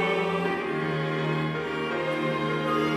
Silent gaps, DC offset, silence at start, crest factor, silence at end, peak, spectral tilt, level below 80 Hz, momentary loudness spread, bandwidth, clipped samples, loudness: none; under 0.1%; 0 s; 14 dB; 0 s; -14 dBFS; -6.5 dB/octave; -62 dBFS; 3 LU; 13.5 kHz; under 0.1%; -27 LUFS